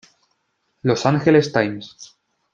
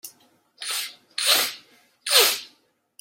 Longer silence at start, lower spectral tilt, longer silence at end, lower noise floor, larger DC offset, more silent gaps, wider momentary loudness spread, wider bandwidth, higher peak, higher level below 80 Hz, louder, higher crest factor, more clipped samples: first, 0.85 s vs 0.05 s; first, -6 dB/octave vs 2.5 dB/octave; about the same, 0.5 s vs 0.55 s; first, -70 dBFS vs -63 dBFS; neither; neither; about the same, 16 LU vs 18 LU; second, 7.6 kHz vs 16.5 kHz; about the same, -2 dBFS vs -2 dBFS; first, -58 dBFS vs -84 dBFS; first, -18 LUFS vs -21 LUFS; second, 18 dB vs 24 dB; neither